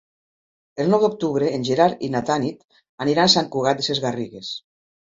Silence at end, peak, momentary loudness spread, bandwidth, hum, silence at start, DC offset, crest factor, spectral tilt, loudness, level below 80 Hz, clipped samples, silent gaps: 0.45 s; -2 dBFS; 14 LU; 7.8 kHz; none; 0.75 s; under 0.1%; 20 dB; -4.5 dB/octave; -20 LUFS; -60 dBFS; under 0.1%; 2.65-2.69 s, 2.89-2.98 s